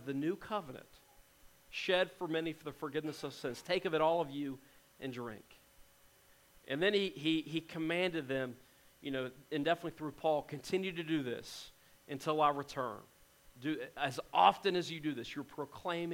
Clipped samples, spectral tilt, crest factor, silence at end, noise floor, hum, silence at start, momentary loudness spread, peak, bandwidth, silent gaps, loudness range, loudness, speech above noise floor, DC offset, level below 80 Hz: under 0.1%; -5 dB/octave; 24 dB; 0 s; -65 dBFS; none; 0 s; 14 LU; -12 dBFS; 16.5 kHz; none; 4 LU; -37 LUFS; 29 dB; under 0.1%; -70 dBFS